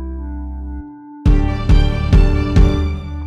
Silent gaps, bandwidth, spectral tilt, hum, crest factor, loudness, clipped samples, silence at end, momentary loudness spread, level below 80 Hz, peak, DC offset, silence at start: none; 7.4 kHz; -8 dB/octave; none; 14 dB; -16 LUFS; under 0.1%; 0 s; 15 LU; -16 dBFS; 0 dBFS; under 0.1%; 0 s